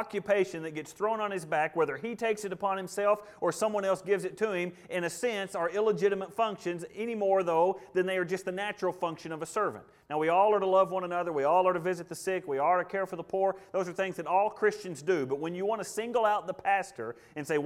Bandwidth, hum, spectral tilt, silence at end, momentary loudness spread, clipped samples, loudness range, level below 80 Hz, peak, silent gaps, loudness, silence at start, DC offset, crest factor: 15.5 kHz; none; -5 dB/octave; 0 s; 9 LU; under 0.1%; 3 LU; -74 dBFS; -14 dBFS; none; -30 LUFS; 0 s; under 0.1%; 16 dB